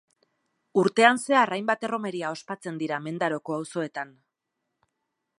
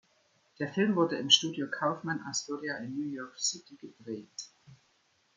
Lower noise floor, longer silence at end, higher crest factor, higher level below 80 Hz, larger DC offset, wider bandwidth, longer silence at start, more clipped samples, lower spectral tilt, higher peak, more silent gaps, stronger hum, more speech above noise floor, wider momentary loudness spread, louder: first, -82 dBFS vs -71 dBFS; first, 1.3 s vs 0.65 s; about the same, 26 dB vs 26 dB; about the same, -80 dBFS vs -80 dBFS; neither; first, 11.5 kHz vs 10 kHz; first, 0.75 s vs 0.6 s; neither; first, -4.5 dB/octave vs -3 dB/octave; first, -2 dBFS vs -8 dBFS; neither; neither; first, 56 dB vs 38 dB; second, 15 LU vs 21 LU; first, -26 LUFS vs -30 LUFS